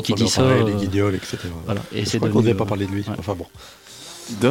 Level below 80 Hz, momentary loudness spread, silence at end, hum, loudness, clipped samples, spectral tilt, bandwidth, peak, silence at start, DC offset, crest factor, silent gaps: -48 dBFS; 20 LU; 0 s; none; -21 LUFS; under 0.1%; -5.5 dB/octave; 17 kHz; -6 dBFS; 0 s; under 0.1%; 16 dB; none